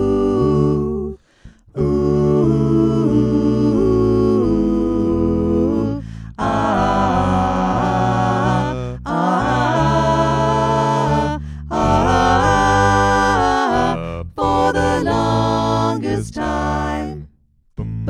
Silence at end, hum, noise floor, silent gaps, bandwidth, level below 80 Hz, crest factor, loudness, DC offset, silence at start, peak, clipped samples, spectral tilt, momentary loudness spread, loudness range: 0 s; none; -55 dBFS; none; 11 kHz; -32 dBFS; 14 dB; -17 LUFS; under 0.1%; 0 s; -2 dBFS; under 0.1%; -6.5 dB/octave; 9 LU; 3 LU